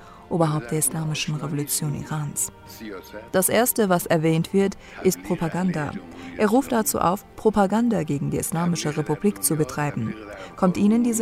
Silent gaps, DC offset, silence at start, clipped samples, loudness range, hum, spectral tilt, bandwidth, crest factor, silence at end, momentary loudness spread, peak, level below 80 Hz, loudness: none; under 0.1%; 0 s; under 0.1%; 2 LU; none; -5 dB/octave; 16 kHz; 16 dB; 0 s; 11 LU; -6 dBFS; -52 dBFS; -23 LUFS